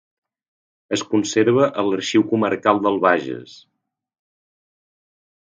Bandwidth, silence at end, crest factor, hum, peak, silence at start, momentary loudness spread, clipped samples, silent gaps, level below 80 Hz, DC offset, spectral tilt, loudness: 9.4 kHz; 1.95 s; 22 dB; none; 0 dBFS; 0.9 s; 9 LU; under 0.1%; none; -66 dBFS; under 0.1%; -5 dB/octave; -19 LUFS